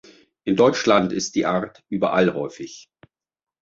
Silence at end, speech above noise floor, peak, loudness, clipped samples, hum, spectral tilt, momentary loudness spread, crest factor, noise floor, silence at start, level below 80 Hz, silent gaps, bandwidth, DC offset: 0.8 s; 36 dB; -2 dBFS; -21 LUFS; under 0.1%; none; -5 dB/octave; 14 LU; 20 dB; -57 dBFS; 0.45 s; -60 dBFS; none; 8 kHz; under 0.1%